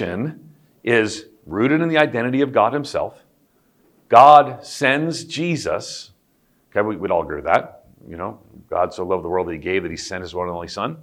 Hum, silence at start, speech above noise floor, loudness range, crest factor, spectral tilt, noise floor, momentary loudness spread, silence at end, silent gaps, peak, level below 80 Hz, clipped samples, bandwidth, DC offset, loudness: none; 0 s; 43 dB; 8 LU; 20 dB; -5 dB/octave; -62 dBFS; 16 LU; 0 s; none; 0 dBFS; -54 dBFS; under 0.1%; 12.5 kHz; under 0.1%; -19 LUFS